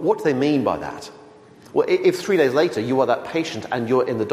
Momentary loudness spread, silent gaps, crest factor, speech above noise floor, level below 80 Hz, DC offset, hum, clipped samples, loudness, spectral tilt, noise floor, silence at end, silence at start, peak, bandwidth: 9 LU; none; 16 dB; 26 dB; -60 dBFS; under 0.1%; none; under 0.1%; -20 LUFS; -6 dB/octave; -46 dBFS; 0 s; 0 s; -6 dBFS; 15.5 kHz